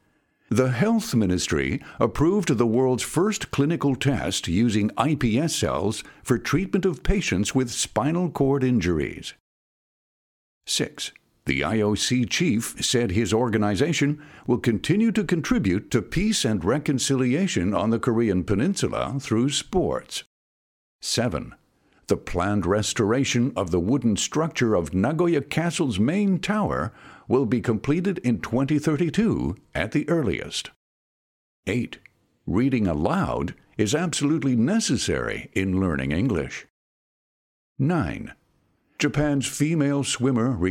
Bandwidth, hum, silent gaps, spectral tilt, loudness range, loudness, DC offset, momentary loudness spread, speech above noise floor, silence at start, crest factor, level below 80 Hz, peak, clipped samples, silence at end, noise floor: 18 kHz; none; 9.40-10.61 s, 20.26-20.99 s, 30.76-31.63 s, 36.70-37.76 s; -5 dB/octave; 5 LU; -24 LUFS; under 0.1%; 7 LU; 43 dB; 0.5 s; 20 dB; -42 dBFS; -4 dBFS; under 0.1%; 0 s; -66 dBFS